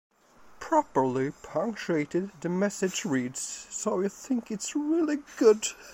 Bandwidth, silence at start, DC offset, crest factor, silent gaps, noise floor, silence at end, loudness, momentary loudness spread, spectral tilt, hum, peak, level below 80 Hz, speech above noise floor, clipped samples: 16.5 kHz; 0.45 s; under 0.1%; 20 dB; none; -55 dBFS; 0 s; -28 LUFS; 9 LU; -4.5 dB/octave; none; -10 dBFS; -66 dBFS; 27 dB; under 0.1%